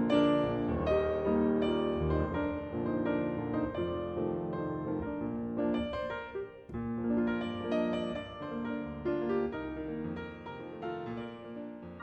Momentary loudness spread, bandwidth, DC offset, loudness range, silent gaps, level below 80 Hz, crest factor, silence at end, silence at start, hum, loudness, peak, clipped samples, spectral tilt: 12 LU; 8.4 kHz; under 0.1%; 6 LU; none; -50 dBFS; 20 dB; 0 s; 0 s; none; -34 LUFS; -14 dBFS; under 0.1%; -8.5 dB/octave